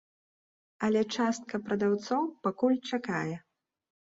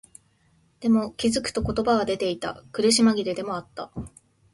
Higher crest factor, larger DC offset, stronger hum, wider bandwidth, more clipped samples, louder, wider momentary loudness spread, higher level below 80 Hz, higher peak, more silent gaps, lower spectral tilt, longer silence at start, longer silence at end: about the same, 16 dB vs 16 dB; neither; neither; second, 7.8 kHz vs 11.5 kHz; neither; second, -31 LUFS vs -24 LUFS; second, 6 LU vs 17 LU; second, -72 dBFS vs -48 dBFS; second, -16 dBFS vs -8 dBFS; neither; first, -5.5 dB/octave vs -4 dB/octave; about the same, 0.8 s vs 0.8 s; first, 0.65 s vs 0.45 s